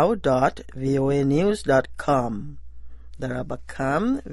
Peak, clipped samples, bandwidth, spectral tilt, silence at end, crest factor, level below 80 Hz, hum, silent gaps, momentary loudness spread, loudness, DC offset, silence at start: -6 dBFS; under 0.1%; 11.5 kHz; -7 dB/octave; 0 s; 18 dB; -44 dBFS; none; none; 12 LU; -23 LUFS; under 0.1%; 0 s